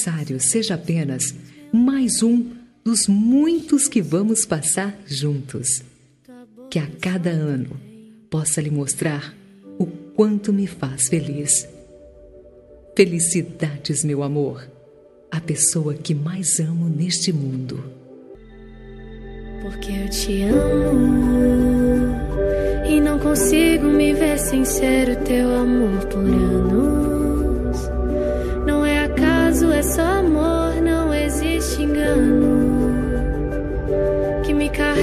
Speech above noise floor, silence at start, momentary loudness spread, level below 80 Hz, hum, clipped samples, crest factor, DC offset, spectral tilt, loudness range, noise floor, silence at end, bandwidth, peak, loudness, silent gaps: 30 dB; 0 s; 11 LU; -30 dBFS; none; under 0.1%; 18 dB; under 0.1%; -5 dB/octave; 7 LU; -48 dBFS; 0 s; 15 kHz; -2 dBFS; -19 LUFS; none